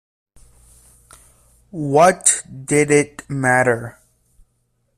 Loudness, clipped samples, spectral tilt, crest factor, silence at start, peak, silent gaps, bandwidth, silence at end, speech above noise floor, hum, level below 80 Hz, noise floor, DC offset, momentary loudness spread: -16 LUFS; under 0.1%; -4 dB/octave; 20 dB; 1.75 s; 0 dBFS; none; 15 kHz; 1.1 s; 50 dB; none; -54 dBFS; -66 dBFS; under 0.1%; 14 LU